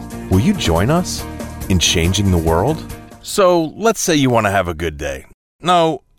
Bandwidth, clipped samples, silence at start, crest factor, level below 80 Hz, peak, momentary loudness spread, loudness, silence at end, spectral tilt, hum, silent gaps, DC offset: 17 kHz; under 0.1%; 0 s; 12 dB; -32 dBFS; -4 dBFS; 12 LU; -16 LUFS; 0.2 s; -4.5 dB/octave; none; 5.34-5.59 s; under 0.1%